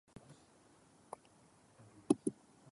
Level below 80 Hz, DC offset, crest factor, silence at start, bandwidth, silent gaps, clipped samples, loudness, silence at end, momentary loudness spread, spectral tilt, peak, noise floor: -80 dBFS; under 0.1%; 28 dB; 2.1 s; 11.5 kHz; none; under 0.1%; -38 LUFS; 0.4 s; 26 LU; -6 dB/octave; -16 dBFS; -67 dBFS